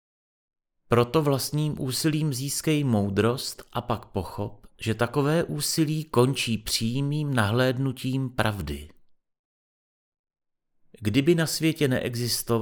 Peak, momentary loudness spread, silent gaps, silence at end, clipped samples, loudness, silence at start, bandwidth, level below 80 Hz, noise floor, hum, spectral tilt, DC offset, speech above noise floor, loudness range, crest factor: -6 dBFS; 9 LU; 9.39-10.12 s, 10.19-10.24 s; 0 s; under 0.1%; -26 LUFS; 0.9 s; over 20 kHz; -50 dBFS; -64 dBFS; none; -5 dB/octave; under 0.1%; 39 dB; 5 LU; 20 dB